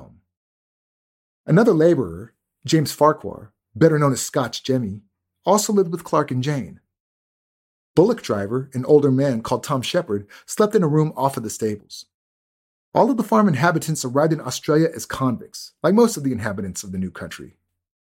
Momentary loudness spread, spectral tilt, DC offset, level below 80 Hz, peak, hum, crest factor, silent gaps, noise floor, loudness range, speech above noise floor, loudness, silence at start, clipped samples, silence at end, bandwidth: 14 LU; -6 dB/octave; under 0.1%; -58 dBFS; -2 dBFS; none; 20 dB; 0.37-1.44 s, 7.00-7.94 s, 12.14-12.92 s; under -90 dBFS; 3 LU; over 71 dB; -20 LUFS; 0 s; under 0.1%; 0.7 s; 16.5 kHz